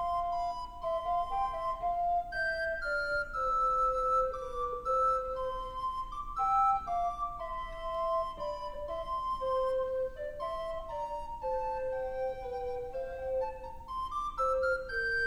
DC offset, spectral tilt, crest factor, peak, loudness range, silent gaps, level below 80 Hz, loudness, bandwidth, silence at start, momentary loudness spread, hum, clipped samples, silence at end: under 0.1%; -4 dB/octave; 14 dB; -20 dBFS; 5 LU; none; -48 dBFS; -34 LUFS; 12 kHz; 0 s; 10 LU; none; under 0.1%; 0 s